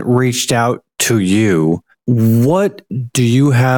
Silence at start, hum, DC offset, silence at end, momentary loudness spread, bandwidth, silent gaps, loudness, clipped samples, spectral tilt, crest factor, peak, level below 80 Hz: 0 s; none; under 0.1%; 0 s; 7 LU; 17.5 kHz; none; -14 LUFS; under 0.1%; -5.5 dB/octave; 10 dB; -4 dBFS; -52 dBFS